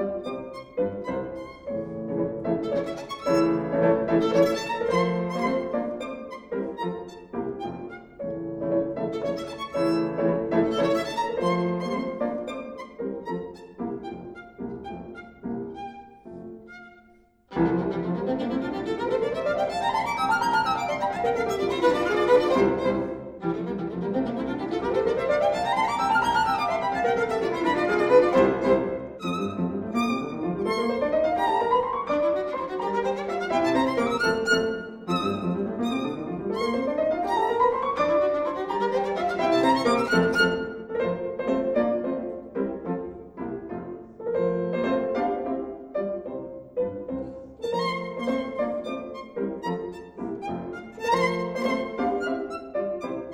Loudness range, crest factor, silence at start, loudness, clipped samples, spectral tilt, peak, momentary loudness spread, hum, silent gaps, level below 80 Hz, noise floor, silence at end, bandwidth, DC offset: 8 LU; 20 dB; 0 s; -26 LUFS; under 0.1%; -6 dB/octave; -6 dBFS; 13 LU; none; none; -54 dBFS; -58 dBFS; 0 s; 16 kHz; under 0.1%